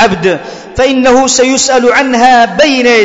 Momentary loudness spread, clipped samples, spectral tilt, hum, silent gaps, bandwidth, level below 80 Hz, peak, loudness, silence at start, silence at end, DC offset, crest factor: 6 LU; 0.3%; -3 dB/octave; none; none; 8 kHz; -36 dBFS; 0 dBFS; -7 LUFS; 0 s; 0 s; under 0.1%; 8 dB